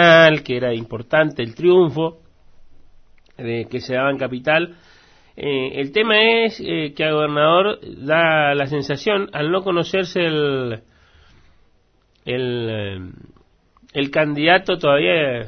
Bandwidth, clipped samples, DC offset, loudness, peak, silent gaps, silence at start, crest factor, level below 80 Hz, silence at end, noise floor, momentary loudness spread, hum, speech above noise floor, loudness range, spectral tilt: 6.6 kHz; under 0.1%; under 0.1%; -18 LUFS; 0 dBFS; none; 0 s; 18 dB; -54 dBFS; 0 s; -59 dBFS; 12 LU; none; 41 dB; 8 LU; -6 dB/octave